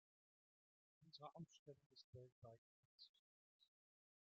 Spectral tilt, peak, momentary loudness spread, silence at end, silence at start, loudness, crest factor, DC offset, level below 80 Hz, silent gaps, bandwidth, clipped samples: -5.5 dB/octave; -44 dBFS; 8 LU; 0.6 s; 1 s; -64 LUFS; 24 dB; under 0.1%; under -90 dBFS; 1.59-1.66 s, 1.86-1.90 s, 2.04-2.13 s, 2.32-2.42 s, 2.58-2.99 s, 3.09-3.60 s; 6.8 kHz; under 0.1%